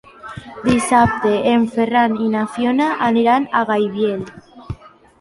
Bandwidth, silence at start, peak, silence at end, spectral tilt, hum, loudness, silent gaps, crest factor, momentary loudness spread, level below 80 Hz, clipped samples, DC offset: 11.5 kHz; 0.25 s; -2 dBFS; 0.45 s; -5.5 dB/octave; none; -17 LUFS; none; 16 dB; 19 LU; -44 dBFS; under 0.1%; under 0.1%